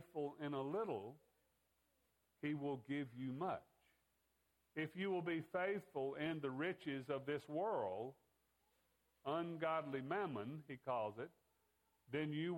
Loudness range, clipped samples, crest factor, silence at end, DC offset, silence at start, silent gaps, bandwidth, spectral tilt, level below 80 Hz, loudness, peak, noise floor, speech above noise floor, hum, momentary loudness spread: 4 LU; under 0.1%; 18 dB; 0 s; under 0.1%; 0 s; none; 17 kHz; -7.5 dB/octave; -86 dBFS; -45 LUFS; -28 dBFS; -83 dBFS; 39 dB; none; 8 LU